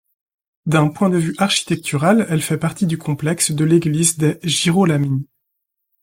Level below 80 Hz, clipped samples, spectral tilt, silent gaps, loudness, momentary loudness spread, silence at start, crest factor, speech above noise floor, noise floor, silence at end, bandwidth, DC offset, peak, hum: -56 dBFS; under 0.1%; -5 dB/octave; none; -17 LUFS; 6 LU; 0.65 s; 16 dB; 59 dB; -76 dBFS; 0.8 s; 16.5 kHz; under 0.1%; -2 dBFS; none